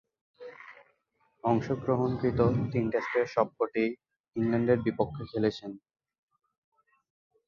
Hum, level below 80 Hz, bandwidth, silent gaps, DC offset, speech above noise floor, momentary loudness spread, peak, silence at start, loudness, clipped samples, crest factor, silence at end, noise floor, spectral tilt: none; -56 dBFS; 7 kHz; 4.20-4.24 s; under 0.1%; 44 dB; 20 LU; -10 dBFS; 0.4 s; -29 LUFS; under 0.1%; 20 dB; 1.7 s; -73 dBFS; -8.5 dB/octave